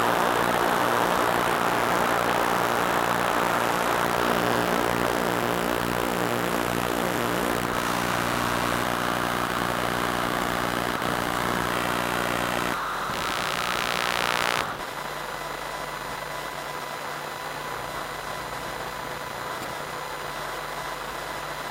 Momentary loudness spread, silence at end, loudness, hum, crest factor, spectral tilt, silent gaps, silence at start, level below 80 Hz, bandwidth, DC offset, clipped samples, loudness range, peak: 9 LU; 0 s; -26 LUFS; none; 22 dB; -3.5 dB/octave; none; 0 s; -48 dBFS; 17 kHz; under 0.1%; under 0.1%; 9 LU; -4 dBFS